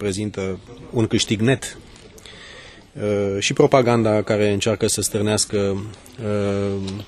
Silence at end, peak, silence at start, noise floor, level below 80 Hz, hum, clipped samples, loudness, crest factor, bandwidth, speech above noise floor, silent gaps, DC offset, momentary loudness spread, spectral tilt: 0 s; 0 dBFS; 0 s; -42 dBFS; -48 dBFS; none; under 0.1%; -20 LUFS; 20 dB; 13 kHz; 22 dB; none; under 0.1%; 22 LU; -4.5 dB/octave